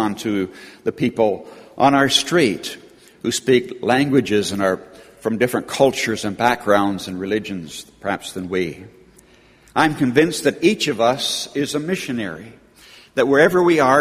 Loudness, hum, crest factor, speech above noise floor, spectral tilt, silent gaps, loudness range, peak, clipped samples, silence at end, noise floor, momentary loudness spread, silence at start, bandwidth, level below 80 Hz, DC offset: -19 LUFS; none; 18 dB; 32 dB; -4.5 dB/octave; none; 4 LU; 0 dBFS; under 0.1%; 0 s; -50 dBFS; 13 LU; 0 s; 15.5 kHz; -56 dBFS; under 0.1%